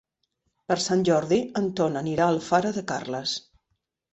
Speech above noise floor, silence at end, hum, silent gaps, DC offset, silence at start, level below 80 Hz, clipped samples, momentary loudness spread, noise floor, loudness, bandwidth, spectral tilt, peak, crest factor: 53 dB; 0.75 s; none; none; under 0.1%; 0.7 s; -62 dBFS; under 0.1%; 8 LU; -77 dBFS; -25 LUFS; 8.4 kHz; -5 dB/octave; -6 dBFS; 20 dB